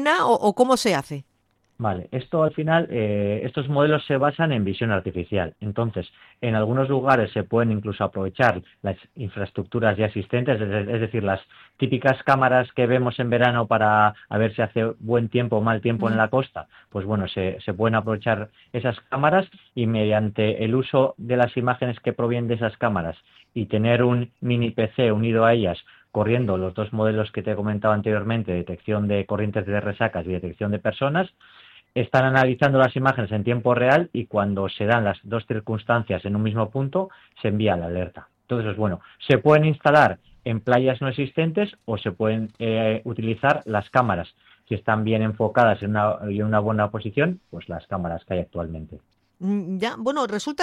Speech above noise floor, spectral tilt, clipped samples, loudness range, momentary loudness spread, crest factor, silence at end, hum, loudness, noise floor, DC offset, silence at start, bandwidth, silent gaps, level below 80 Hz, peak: 45 dB; -7 dB/octave; under 0.1%; 4 LU; 11 LU; 20 dB; 0 s; none; -23 LUFS; -67 dBFS; under 0.1%; 0 s; 12 kHz; none; -54 dBFS; -4 dBFS